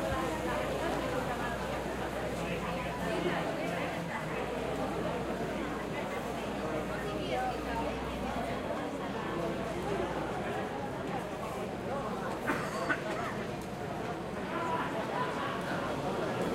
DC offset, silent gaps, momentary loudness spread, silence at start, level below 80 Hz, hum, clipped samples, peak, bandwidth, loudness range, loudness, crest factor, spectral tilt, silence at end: under 0.1%; none; 4 LU; 0 s; -50 dBFS; none; under 0.1%; -14 dBFS; 16 kHz; 1 LU; -35 LUFS; 20 dB; -5.5 dB/octave; 0 s